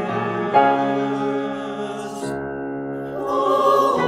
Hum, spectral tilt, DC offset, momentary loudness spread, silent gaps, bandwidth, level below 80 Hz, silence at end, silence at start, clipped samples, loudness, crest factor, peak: none; -6 dB/octave; under 0.1%; 12 LU; none; 14.5 kHz; -58 dBFS; 0 s; 0 s; under 0.1%; -21 LUFS; 18 dB; -2 dBFS